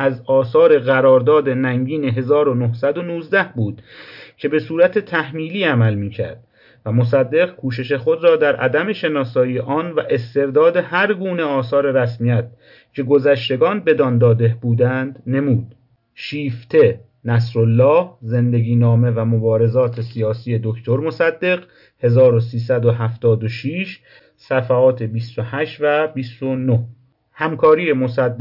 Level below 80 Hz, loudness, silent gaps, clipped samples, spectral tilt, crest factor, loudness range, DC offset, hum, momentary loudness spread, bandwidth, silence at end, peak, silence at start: -62 dBFS; -17 LUFS; none; under 0.1%; -9.5 dB/octave; 14 dB; 3 LU; under 0.1%; none; 11 LU; 5.8 kHz; 0 s; -4 dBFS; 0 s